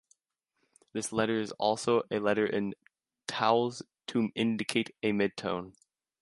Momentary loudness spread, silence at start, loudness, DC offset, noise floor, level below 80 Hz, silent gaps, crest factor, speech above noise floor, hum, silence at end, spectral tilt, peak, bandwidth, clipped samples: 11 LU; 0.95 s; -31 LUFS; under 0.1%; -82 dBFS; -70 dBFS; none; 22 dB; 52 dB; none; 0.5 s; -4.5 dB/octave; -10 dBFS; 11.5 kHz; under 0.1%